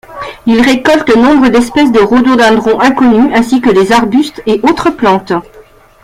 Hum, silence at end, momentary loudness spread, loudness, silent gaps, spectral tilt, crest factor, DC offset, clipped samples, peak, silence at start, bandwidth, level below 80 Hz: none; 0.45 s; 6 LU; -8 LUFS; none; -5 dB/octave; 8 dB; under 0.1%; under 0.1%; 0 dBFS; 0.1 s; 15 kHz; -36 dBFS